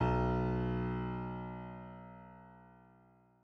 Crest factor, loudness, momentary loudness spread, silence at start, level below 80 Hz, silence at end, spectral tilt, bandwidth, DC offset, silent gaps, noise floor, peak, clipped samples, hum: 16 dB; -37 LUFS; 23 LU; 0 s; -48 dBFS; 0.7 s; -9.5 dB/octave; 6.4 kHz; under 0.1%; none; -65 dBFS; -22 dBFS; under 0.1%; 60 Hz at -65 dBFS